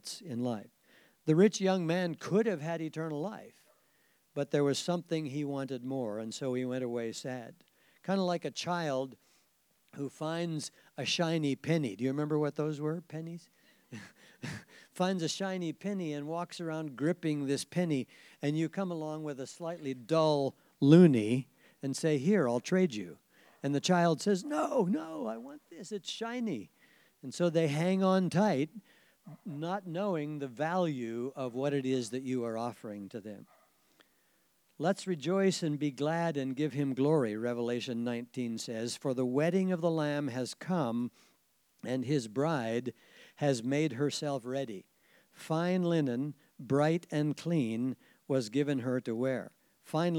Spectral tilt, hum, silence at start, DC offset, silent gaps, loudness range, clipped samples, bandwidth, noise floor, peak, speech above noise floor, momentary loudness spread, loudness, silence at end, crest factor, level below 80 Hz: -6 dB/octave; none; 0.05 s; under 0.1%; none; 8 LU; under 0.1%; 16 kHz; -72 dBFS; -8 dBFS; 40 dB; 14 LU; -33 LUFS; 0 s; 24 dB; -86 dBFS